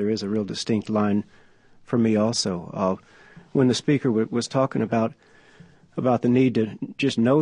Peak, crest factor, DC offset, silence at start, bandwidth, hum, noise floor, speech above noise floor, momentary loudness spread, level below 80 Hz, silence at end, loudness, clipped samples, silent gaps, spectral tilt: -8 dBFS; 16 dB; under 0.1%; 0 s; 10.5 kHz; none; -51 dBFS; 29 dB; 8 LU; -58 dBFS; 0 s; -23 LUFS; under 0.1%; none; -6 dB/octave